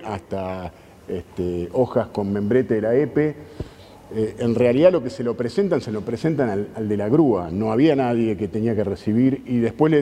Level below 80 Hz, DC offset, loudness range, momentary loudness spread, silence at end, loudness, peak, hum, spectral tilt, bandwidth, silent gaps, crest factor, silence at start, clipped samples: -52 dBFS; under 0.1%; 3 LU; 13 LU; 0 s; -21 LUFS; -2 dBFS; none; -8.5 dB/octave; 11.5 kHz; none; 18 dB; 0 s; under 0.1%